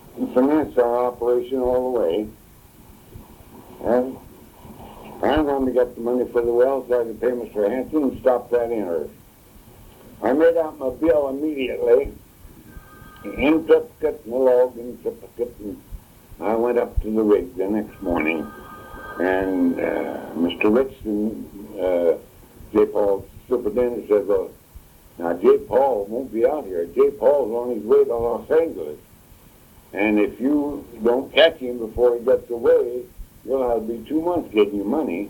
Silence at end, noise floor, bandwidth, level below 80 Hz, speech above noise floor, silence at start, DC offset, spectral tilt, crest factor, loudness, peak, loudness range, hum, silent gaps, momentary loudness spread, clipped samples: 0 s; -49 dBFS; 18 kHz; -44 dBFS; 29 dB; 0.05 s; under 0.1%; -6.5 dB/octave; 20 dB; -21 LUFS; -2 dBFS; 4 LU; none; none; 13 LU; under 0.1%